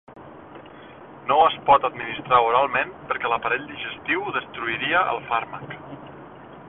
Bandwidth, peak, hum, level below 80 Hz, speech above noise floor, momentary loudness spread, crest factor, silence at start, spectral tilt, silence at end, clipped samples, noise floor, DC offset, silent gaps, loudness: 4 kHz; -4 dBFS; none; -58 dBFS; 21 dB; 24 LU; 20 dB; 0.1 s; -8.5 dB/octave; 0 s; under 0.1%; -43 dBFS; under 0.1%; none; -22 LUFS